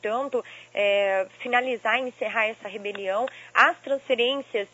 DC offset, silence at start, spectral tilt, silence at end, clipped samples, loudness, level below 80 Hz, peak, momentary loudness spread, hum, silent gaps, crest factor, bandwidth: under 0.1%; 0 s; -3 dB/octave; 0.1 s; under 0.1%; -25 LUFS; -76 dBFS; -2 dBFS; 11 LU; none; none; 22 dB; 8 kHz